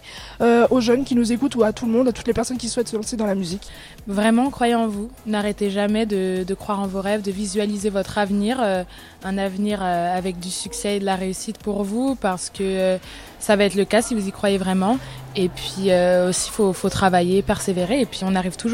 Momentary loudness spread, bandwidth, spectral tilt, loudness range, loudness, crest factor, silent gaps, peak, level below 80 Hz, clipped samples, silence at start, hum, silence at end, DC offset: 9 LU; 16 kHz; -5 dB/octave; 4 LU; -21 LUFS; 16 dB; none; -4 dBFS; -44 dBFS; under 0.1%; 0.05 s; none; 0 s; under 0.1%